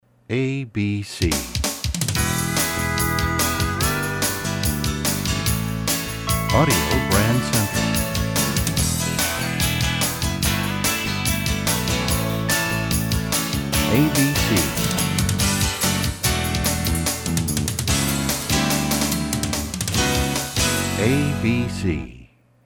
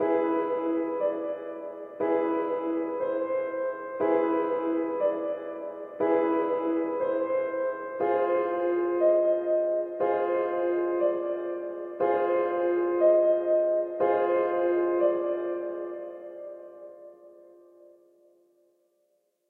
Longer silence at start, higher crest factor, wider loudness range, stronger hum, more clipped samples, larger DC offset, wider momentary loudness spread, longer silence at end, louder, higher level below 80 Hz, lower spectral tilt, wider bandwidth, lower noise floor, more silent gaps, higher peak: first, 0.3 s vs 0 s; about the same, 18 dB vs 16 dB; second, 2 LU vs 5 LU; neither; neither; neither; second, 5 LU vs 12 LU; second, 0.4 s vs 2.2 s; first, -21 LUFS vs -27 LUFS; first, -32 dBFS vs -78 dBFS; second, -3.5 dB/octave vs -8.5 dB/octave; first, 19.5 kHz vs 3.8 kHz; second, -48 dBFS vs -72 dBFS; neither; first, -4 dBFS vs -12 dBFS